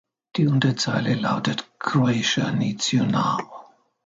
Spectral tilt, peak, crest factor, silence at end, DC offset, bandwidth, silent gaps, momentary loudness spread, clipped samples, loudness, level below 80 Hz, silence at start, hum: -5 dB/octave; -6 dBFS; 18 dB; 0.4 s; under 0.1%; 9.2 kHz; none; 8 LU; under 0.1%; -22 LUFS; -64 dBFS; 0.35 s; none